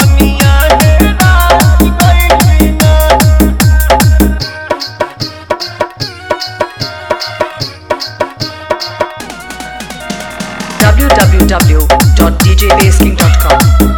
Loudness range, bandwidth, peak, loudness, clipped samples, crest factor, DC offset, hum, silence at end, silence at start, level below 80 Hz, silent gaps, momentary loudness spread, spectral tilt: 10 LU; over 20 kHz; 0 dBFS; -9 LUFS; 1%; 8 dB; under 0.1%; none; 0 s; 0 s; -12 dBFS; none; 13 LU; -5 dB/octave